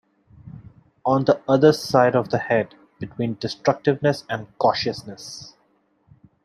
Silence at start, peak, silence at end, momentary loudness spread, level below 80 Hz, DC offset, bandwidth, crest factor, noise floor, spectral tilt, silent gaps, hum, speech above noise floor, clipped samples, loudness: 0.45 s; -2 dBFS; 0.95 s; 19 LU; -60 dBFS; under 0.1%; 13.5 kHz; 20 dB; -64 dBFS; -6 dB/octave; none; none; 43 dB; under 0.1%; -21 LUFS